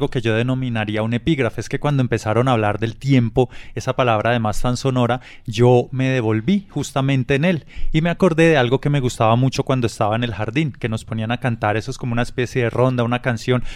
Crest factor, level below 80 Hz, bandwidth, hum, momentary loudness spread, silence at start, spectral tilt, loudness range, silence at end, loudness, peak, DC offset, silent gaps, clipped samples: 16 dB; -34 dBFS; 12.5 kHz; none; 8 LU; 0 s; -6.5 dB/octave; 3 LU; 0 s; -19 LUFS; -2 dBFS; under 0.1%; none; under 0.1%